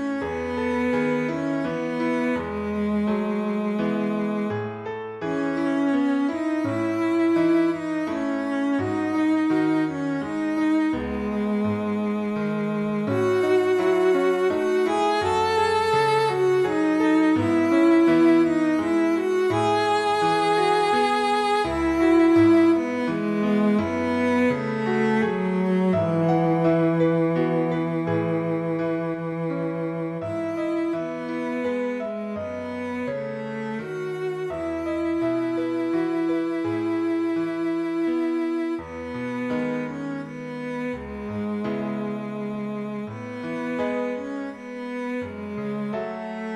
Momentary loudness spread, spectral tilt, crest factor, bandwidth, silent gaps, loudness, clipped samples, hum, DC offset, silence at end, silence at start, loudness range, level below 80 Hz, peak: 10 LU; -7 dB/octave; 14 dB; 11.5 kHz; none; -24 LUFS; under 0.1%; none; under 0.1%; 0 s; 0 s; 9 LU; -54 dBFS; -8 dBFS